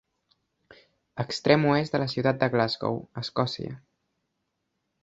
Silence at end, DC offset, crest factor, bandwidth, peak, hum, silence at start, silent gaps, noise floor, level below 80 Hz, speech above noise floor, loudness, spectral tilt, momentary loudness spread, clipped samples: 1.25 s; under 0.1%; 26 dB; 8 kHz; -2 dBFS; none; 1.15 s; none; -79 dBFS; -62 dBFS; 53 dB; -26 LUFS; -6.5 dB/octave; 15 LU; under 0.1%